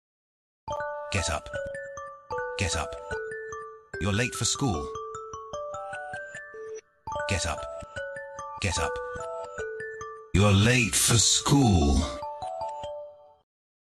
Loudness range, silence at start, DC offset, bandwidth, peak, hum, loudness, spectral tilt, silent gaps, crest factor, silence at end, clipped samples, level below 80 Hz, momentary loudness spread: 10 LU; 0.65 s; under 0.1%; 13 kHz; -10 dBFS; none; -27 LUFS; -4 dB/octave; none; 18 dB; 0.55 s; under 0.1%; -40 dBFS; 19 LU